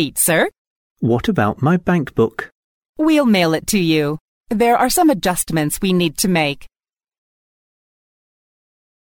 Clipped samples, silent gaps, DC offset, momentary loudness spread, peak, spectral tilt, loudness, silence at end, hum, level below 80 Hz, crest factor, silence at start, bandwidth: under 0.1%; 0.58-0.96 s, 2.55-2.81 s, 2.89-2.93 s, 4.21-4.41 s; under 0.1%; 9 LU; -4 dBFS; -4.5 dB/octave; -17 LUFS; 2.4 s; none; -44 dBFS; 14 dB; 0 s; 17.5 kHz